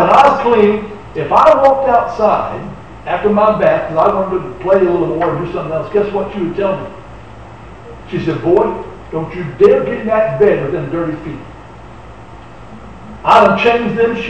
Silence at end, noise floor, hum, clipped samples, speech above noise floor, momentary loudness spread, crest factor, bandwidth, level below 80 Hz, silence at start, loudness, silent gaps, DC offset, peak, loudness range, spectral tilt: 0 s; -34 dBFS; none; under 0.1%; 22 dB; 19 LU; 14 dB; 8.8 kHz; -40 dBFS; 0 s; -13 LUFS; none; 0.9%; 0 dBFS; 7 LU; -7 dB/octave